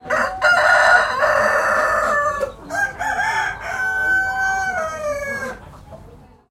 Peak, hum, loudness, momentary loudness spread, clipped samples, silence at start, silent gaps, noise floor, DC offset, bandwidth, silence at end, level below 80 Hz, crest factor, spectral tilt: 0 dBFS; none; -18 LUFS; 12 LU; under 0.1%; 0.05 s; none; -44 dBFS; under 0.1%; 16.5 kHz; 0.35 s; -46 dBFS; 18 dB; -2.5 dB/octave